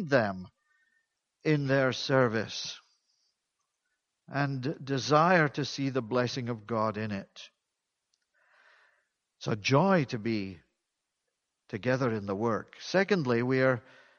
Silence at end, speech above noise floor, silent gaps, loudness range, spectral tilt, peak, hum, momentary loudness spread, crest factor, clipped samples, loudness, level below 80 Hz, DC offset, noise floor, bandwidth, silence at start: 0.4 s; 56 dB; none; 5 LU; -6 dB/octave; -8 dBFS; none; 13 LU; 22 dB; under 0.1%; -29 LUFS; -70 dBFS; under 0.1%; -85 dBFS; 7.2 kHz; 0 s